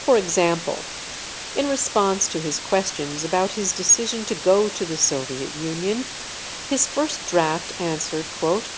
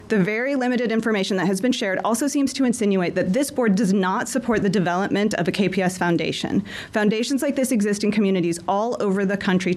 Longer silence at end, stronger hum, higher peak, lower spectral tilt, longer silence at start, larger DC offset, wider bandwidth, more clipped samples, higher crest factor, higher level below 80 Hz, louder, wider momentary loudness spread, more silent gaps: about the same, 0 s vs 0 s; neither; about the same, -4 dBFS vs -6 dBFS; second, -2.5 dB/octave vs -5.5 dB/octave; about the same, 0 s vs 0 s; neither; second, 8 kHz vs 13 kHz; neither; about the same, 18 dB vs 14 dB; about the same, -54 dBFS vs -56 dBFS; about the same, -22 LUFS vs -21 LUFS; first, 11 LU vs 3 LU; neither